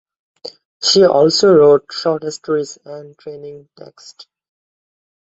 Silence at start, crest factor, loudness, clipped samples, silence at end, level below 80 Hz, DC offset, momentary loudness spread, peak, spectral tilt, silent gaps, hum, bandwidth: 0.45 s; 16 dB; -13 LUFS; under 0.1%; 1.65 s; -58 dBFS; under 0.1%; 24 LU; 0 dBFS; -4 dB/octave; 0.65-0.80 s; none; 8 kHz